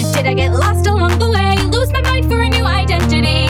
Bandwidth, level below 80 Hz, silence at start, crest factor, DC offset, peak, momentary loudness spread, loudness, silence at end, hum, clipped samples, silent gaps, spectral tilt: 15.5 kHz; -22 dBFS; 0 s; 12 dB; under 0.1%; -2 dBFS; 1 LU; -14 LUFS; 0 s; none; under 0.1%; none; -5.5 dB/octave